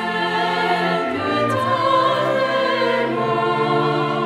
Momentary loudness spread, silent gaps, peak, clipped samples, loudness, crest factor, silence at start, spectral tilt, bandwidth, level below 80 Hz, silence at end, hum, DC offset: 3 LU; none; -6 dBFS; under 0.1%; -19 LUFS; 14 dB; 0 s; -5.5 dB/octave; 14.5 kHz; -58 dBFS; 0 s; none; under 0.1%